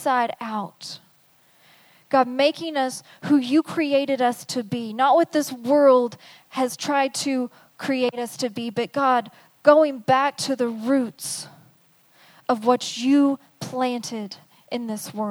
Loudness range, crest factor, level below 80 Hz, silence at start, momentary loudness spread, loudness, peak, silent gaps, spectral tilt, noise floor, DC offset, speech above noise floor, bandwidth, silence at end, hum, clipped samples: 4 LU; 22 dB; -76 dBFS; 0 s; 15 LU; -22 LUFS; -2 dBFS; none; -4 dB/octave; -58 dBFS; under 0.1%; 37 dB; over 20 kHz; 0 s; none; under 0.1%